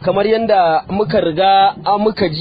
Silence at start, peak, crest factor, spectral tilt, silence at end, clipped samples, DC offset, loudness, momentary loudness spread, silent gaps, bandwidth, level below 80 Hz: 0 s; -2 dBFS; 12 dB; -9 dB/octave; 0 s; under 0.1%; under 0.1%; -14 LUFS; 5 LU; none; 5 kHz; -46 dBFS